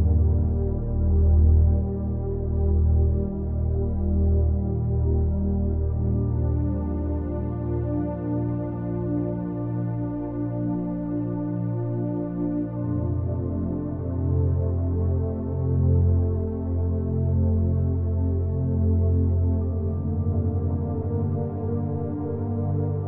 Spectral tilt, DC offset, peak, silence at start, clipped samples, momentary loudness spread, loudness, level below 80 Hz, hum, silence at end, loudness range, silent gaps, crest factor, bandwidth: -15.5 dB/octave; under 0.1%; -10 dBFS; 0 s; under 0.1%; 6 LU; -25 LUFS; -28 dBFS; none; 0 s; 5 LU; none; 14 dB; 1.9 kHz